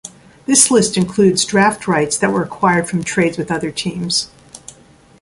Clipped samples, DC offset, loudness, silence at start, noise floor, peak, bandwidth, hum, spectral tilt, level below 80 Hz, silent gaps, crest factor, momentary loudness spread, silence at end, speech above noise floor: under 0.1%; under 0.1%; -15 LUFS; 0.05 s; -46 dBFS; 0 dBFS; 11.5 kHz; none; -3.5 dB/octave; -50 dBFS; none; 16 dB; 10 LU; 0.65 s; 31 dB